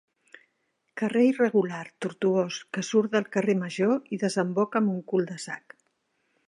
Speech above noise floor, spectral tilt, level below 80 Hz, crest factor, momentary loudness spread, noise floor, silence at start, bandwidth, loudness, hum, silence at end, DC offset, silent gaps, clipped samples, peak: 49 dB; -6 dB/octave; -78 dBFS; 18 dB; 11 LU; -75 dBFS; 0.95 s; 11.5 kHz; -26 LUFS; none; 0.9 s; under 0.1%; none; under 0.1%; -10 dBFS